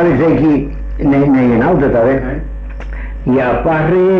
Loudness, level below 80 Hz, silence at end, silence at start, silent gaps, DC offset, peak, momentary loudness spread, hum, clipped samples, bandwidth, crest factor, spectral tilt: -12 LUFS; -26 dBFS; 0 s; 0 s; none; under 0.1%; -4 dBFS; 15 LU; none; under 0.1%; 5.8 kHz; 8 dB; -10 dB/octave